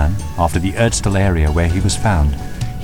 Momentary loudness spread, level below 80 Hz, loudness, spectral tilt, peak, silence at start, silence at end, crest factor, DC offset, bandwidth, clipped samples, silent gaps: 5 LU; -22 dBFS; -17 LUFS; -5.5 dB/octave; -2 dBFS; 0 s; 0 s; 14 dB; under 0.1%; 16.5 kHz; under 0.1%; none